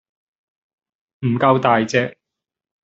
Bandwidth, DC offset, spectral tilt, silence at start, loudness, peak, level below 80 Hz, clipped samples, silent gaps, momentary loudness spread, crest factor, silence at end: 8 kHz; under 0.1%; -5 dB/octave; 1.2 s; -18 LUFS; -2 dBFS; -60 dBFS; under 0.1%; none; 11 LU; 20 dB; 0.75 s